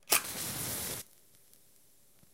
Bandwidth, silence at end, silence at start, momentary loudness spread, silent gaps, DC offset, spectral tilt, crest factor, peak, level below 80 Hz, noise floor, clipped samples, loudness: 17 kHz; 1.3 s; 0.1 s; 13 LU; none; under 0.1%; -1 dB/octave; 32 dB; -8 dBFS; -64 dBFS; -66 dBFS; under 0.1%; -33 LUFS